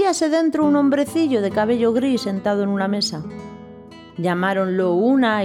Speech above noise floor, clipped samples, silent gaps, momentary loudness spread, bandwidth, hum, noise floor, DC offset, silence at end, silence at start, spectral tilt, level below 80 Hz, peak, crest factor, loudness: 22 dB; under 0.1%; none; 15 LU; 14 kHz; none; -40 dBFS; under 0.1%; 0 s; 0 s; -5.5 dB/octave; -58 dBFS; -6 dBFS; 12 dB; -19 LUFS